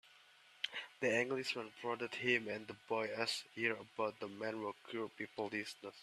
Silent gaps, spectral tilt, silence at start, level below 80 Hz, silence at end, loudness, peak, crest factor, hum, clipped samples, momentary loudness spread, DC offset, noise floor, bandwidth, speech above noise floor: none; -3.5 dB/octave; 0.05 s; -84 dBFS; 0 s; -40 LUFS; -18 dBFS; 24 dB; none; under 0.1%; 10 LU; under 0.1%; -65 dBFS; 14 kHz; 24 dB